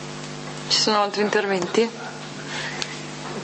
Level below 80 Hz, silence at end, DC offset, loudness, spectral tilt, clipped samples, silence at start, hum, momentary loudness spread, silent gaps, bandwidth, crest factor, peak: -62 dBFS; 0 s; under 0.1%; -23 LUFS; -3 dB/octave; under 0.1%; 0 s; none; 14 LU; none; 8.8 kHz; 20 dB; -4 dBFS